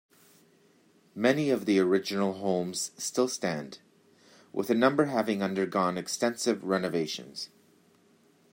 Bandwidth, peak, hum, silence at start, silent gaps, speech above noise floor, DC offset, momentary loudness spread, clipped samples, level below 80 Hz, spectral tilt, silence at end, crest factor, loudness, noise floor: 16 kHz; -8 dBFS; none; 1.15 s; none; 35 dB; under 0.1%; 13 LU; under 0.1%; -76 dBFS; -4.5 dB/octave; 1.05 s; 22 dB; -29 LUFS; -63 dBFS